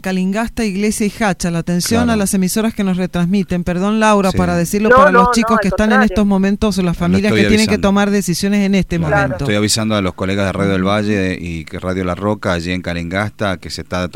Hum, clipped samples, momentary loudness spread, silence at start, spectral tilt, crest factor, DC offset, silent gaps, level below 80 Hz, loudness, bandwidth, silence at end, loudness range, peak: none; under 0.1%; 8 LU; 0.05 s; -5.5 dB/octave; 14 dB; 0.8%; none; -34 dBFS; -15 LUFS; 16 kHz; 0.05 s; 6 LU; 0 dBFS